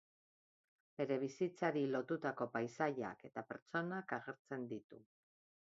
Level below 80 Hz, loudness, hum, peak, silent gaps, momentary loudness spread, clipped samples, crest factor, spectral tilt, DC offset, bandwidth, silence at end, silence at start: -86 dBFS; -42 LUFS; none; -22 dBFS; 3.62-3.66 s, 4.39-4.45 s, 4.84-4.90 s; 10 LU; under 0.1%; 22 dB; -5.5 dB/octave; under 0.1%; 7.6 kHz; 0.75 s; 1 s